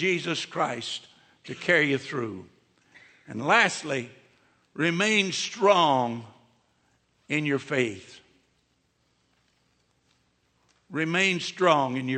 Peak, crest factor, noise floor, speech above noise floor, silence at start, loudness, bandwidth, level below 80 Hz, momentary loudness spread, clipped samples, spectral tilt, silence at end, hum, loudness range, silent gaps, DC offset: -6 dBFS; 22 dB; -70 dBFS; 45 dB; 0 s; -25 LUFS; 8.8 kHz; -76 dBFS; 16 LU; under 0.1%; -4 dB/octave; 0 s; none; 9 LU; none; under 0.1%